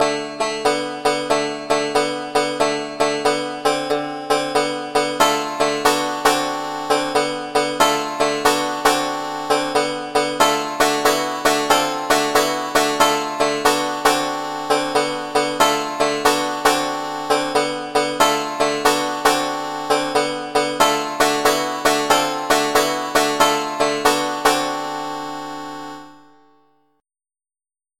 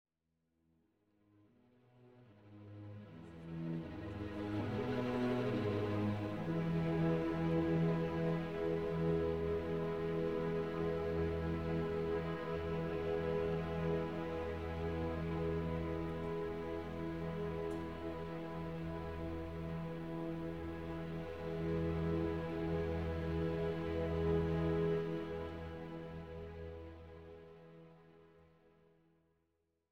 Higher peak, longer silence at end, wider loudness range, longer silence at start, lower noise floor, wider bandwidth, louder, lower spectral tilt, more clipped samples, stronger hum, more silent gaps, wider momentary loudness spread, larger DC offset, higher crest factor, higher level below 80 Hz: first, 0 dBFS vs -24 dBFS; first, 1.8 s vs 0 s; second, 3 LU vs 13 LU; about the same, 0 s vs 0.05 s; first, under -90 dBFS vs -84 dBFS; first, 17 kHz vs 6.6 kHz; first, -19 LUFS vs -39 LUFS; second, -2 dB/octave vs -8.5 dB/octave; neither; neither; neither; second, 6 LU vs 13 LU; neither; about the same, 20 dB vs 16 dB; about the same, -52 dBFS vs -54 dBFS